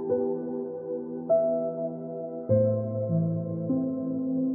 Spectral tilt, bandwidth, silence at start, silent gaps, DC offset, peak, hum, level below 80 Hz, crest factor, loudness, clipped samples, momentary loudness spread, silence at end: -11 dB/octave; 2.1 kHz; 0 s; none; under 0.1%; -12 dBFS; none; -66 dBFS; 16 dB; -29 LUFS; under 0.1%; 10 LU; 0 s